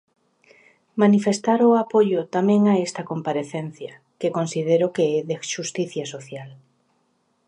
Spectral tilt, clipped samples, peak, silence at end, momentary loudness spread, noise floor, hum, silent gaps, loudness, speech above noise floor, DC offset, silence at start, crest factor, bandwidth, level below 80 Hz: -6 dB/octave; under 0.1%; -4 dBFS; 0.95 s; 16 LU; -68 dBFS; none; none; -21 LUFS; 47 dB; under 0.1%; 0.95 s; 18 dB; 10.5 kHz; -74 dBFS